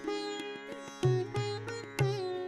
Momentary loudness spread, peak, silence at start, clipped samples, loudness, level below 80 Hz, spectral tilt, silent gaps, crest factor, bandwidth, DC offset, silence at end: 10 LU; -16 dBFS; 0 s; under 0.1%; -35 LUFS; -64 dBFS; -6 dB/octave; none; 18 dB; 13 kHz; under 0.1%; 0 s